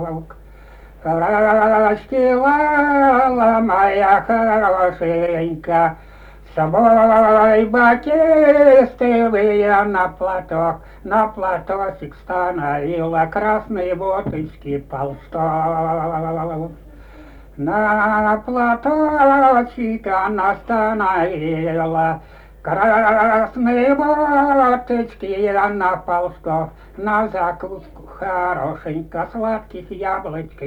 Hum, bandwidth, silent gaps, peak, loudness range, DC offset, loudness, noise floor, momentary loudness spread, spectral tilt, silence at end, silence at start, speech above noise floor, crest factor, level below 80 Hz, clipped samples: none; 9.2 kHz; none; 0 dBFS; 9 LU; under 0.1%; -17 LUFS; -41 dBFS; 14 LU; -8.5 dB/octave; 0 s; 0 s; 24 dB; 16 dB; -42 dBFS; under 0.1%